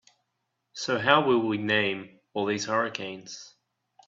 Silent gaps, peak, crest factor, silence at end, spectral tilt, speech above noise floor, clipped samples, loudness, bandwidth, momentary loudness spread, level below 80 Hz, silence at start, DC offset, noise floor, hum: none; -4 dBFS; 24 dB; 0.6 s; -4 dB/octave; 53 dB; under 0.1%; -26 LUFS; 7.8 kHz; 19 LU; -72 dBFS; 0.75 s; under 0.1%; -80 dBFS; none